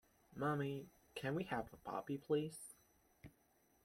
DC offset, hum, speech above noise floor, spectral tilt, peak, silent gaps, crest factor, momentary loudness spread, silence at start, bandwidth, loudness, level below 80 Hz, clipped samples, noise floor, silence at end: under 0.1%; none; 33 dB; -6 dB/octave; -26 dBFS; none; 20 dB; 23 LU; 0.35 s; 16.5 kHz; -44 LUFS; -74 dBFS; under 0.1%; -76 dBFS; 0.55 s